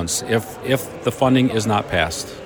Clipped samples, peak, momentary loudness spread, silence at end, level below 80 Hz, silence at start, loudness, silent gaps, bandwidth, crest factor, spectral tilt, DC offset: under 0.1%; -4 dBFS; 6 LU; 0 s; -44 dBFS; 0 s; -20 LUFS; none; over 20 kHz; 16 dB; -4.5 dB/octave; under 0.1%